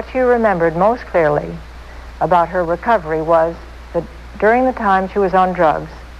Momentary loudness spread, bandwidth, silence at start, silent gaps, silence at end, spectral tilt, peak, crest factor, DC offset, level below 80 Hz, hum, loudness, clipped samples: 17 LU; 11 kHz; 0 s; none; 0 s; -7.5 dB/octave; -2 dBFS; 14 dB; under 0.1%; -36 dBFS; none; -16 LUFS; under 0.1%